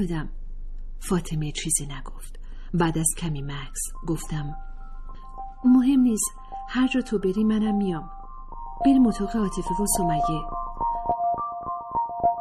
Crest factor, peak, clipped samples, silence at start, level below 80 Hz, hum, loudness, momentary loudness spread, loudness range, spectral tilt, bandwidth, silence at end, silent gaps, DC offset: 16 dB; -8 dBFS; under 0.1%; 0 s; -36 dBFS; none; -25 LUFS; 23 LU; 5 LU; -5 dB/octave; 14.5 kHz; 0 s; none; under 0.1%